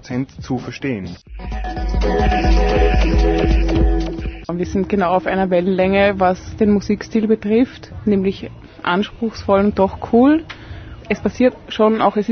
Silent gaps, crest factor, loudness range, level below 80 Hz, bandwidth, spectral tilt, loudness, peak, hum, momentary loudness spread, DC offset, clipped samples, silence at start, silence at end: none; 14 dB; 2 LU; -24 dBFS; 6.6 kHz; -7.5 dB/octave; -18 LUFS; -2 dBFS; none; 12 LU; under 0.1%; under 0.1%; 0.05 s; 0 s